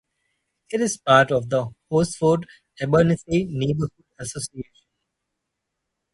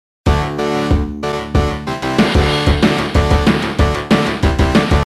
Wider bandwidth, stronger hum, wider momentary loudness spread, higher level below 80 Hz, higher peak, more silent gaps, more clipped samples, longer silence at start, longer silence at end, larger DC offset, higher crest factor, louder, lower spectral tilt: second, 11.5 kHz vs 13 kHz; neither; first, 16 LU vs 5 LU; second, -52 dBFS vs -20 dBFS; about the same, -2 dBFS vs 0 dBFS; neither; neither; first, 0.7 s vs 0.25 s; first, 1.5 s vs 0 s; neither; first, 22 dB vs 14 dB; second, -22 LUFS vs -15 LUFS; about the same, -5.5 dB/octave vs -6 dB/octave